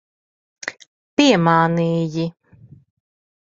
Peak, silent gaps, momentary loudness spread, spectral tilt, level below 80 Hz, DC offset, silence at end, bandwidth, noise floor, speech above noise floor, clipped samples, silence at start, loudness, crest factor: -2 dBFS; 0.87-1.17 s; 17 LU; -5.5 dB/octave; -60 dBFS; under 0.1%; 1.3 s; 7.8 kHz; -47 dBFS; 31 dB; under 0.1%; 0.65 s; -17 LUFS; 20 dB